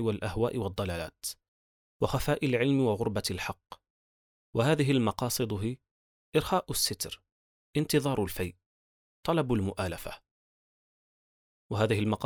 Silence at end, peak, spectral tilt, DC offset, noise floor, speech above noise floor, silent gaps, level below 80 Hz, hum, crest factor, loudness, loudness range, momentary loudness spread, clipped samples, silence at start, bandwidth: 0 s; -12 dBFS; -5 dB/octave; under 0.1%; under -90 dBFS; over 61 dB; 1.48-2.00 s, 3.90-4.53 s, 5.91-6.32 s, 7.32-7.73 s, 8.66-9.23 s, 10.31-11.70 s; -54 dBFS; none; 20 dB; -30 LUFS; 4 LU; 12 LU; under 0.1%; 0 s; over 20 kHz